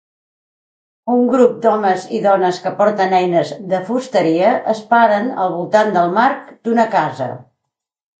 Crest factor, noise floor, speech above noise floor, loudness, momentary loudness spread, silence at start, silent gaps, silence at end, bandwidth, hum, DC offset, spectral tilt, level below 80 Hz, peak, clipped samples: 16 dB; -78 dBFS; 64 dB; -15 LUFS; 8 LU; 1.05 s; none; 0.75 s; 9 kHz; none; under 0.1%; -6 dB/octave; -68 dBFS; 0 dBFS; under 0.1%